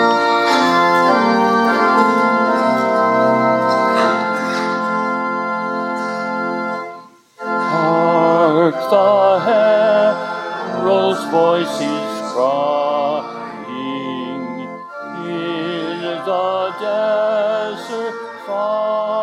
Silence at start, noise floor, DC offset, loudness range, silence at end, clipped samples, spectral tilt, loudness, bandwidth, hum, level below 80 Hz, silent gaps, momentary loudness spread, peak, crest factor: 0 s; -38 dBFS; under 0.1%; 8 LU; 0 s; under 0.1%; -5.5 dB/octave; -16 LUFS; 14.5 kHz; none; -72 dBFS; none; 12 LU; 0 dBFS; 16 dB